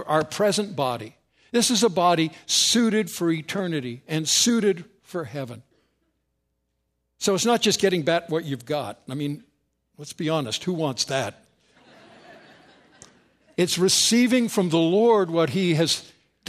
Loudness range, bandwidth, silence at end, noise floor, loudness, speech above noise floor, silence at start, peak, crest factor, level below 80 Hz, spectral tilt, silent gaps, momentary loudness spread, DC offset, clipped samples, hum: 8 LU; 15.5 kHz; 0.45 s; -75 dBFS; -22 LUFS; 53 dB; 0 s; -6 dBFS; 18 dB; -66 dBFS; -3.5 dB/octave; none; 15 LU; under 0.1%; under 0.1%; none